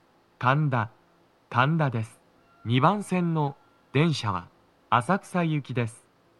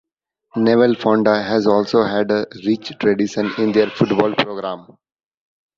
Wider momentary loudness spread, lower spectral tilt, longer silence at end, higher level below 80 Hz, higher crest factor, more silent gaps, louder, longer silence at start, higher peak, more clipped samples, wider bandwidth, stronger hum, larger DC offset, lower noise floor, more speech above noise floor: first, 11 LU vs 7 LU; about the same, -6.5 dB/octave vs -6.5 dB/octave; second, 0.45 s vs 0.95 s; second, -70 dBFS vs -58 dBFS; about the same, 22 dB vs 18 dB; neither; second, -26 LUFS vs -17 LUFS; second, 0.4 s vs 0.55 s; second, -4 dBFS vs 0 dBFS; neither; first, 12 kHz vs 7.6 kHz; neither; neither; about the same, -62 dBFS vs -64 dBFS; second, 37 dB vs 47 dB